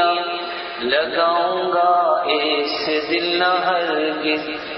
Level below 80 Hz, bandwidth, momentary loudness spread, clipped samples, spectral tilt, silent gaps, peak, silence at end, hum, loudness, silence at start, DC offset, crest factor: -62 dBFS; 6 kHz; 6 LU; under 0.1%; -5.5 dB/octave; none; -4 dBFS; 0 s; none; -19 LUFS; 0 s; under 0.1%; 14 dB